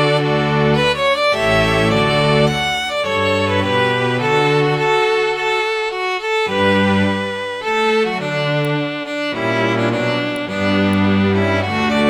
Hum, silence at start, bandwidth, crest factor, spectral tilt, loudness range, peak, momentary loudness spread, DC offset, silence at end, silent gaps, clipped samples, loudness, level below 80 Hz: none; 0 s; 16 kHz; 14 dB; -5.5 dB/octave; 3 LU; -2 dBFS; 5 LU; under 0.1%; 0 s; none; under 0.1%; -16 LUFS; -42 dBFS